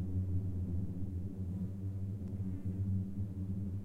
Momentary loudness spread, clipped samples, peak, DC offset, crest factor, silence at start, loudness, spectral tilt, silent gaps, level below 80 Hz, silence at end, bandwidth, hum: 4 LU; under 0.1%; -26 dBFS; under 0.1%; 12 dB; 0 s; -40 LUFS; -11 dB/octave; none; -52 dBFS; 0 s; 2.2 kHz; none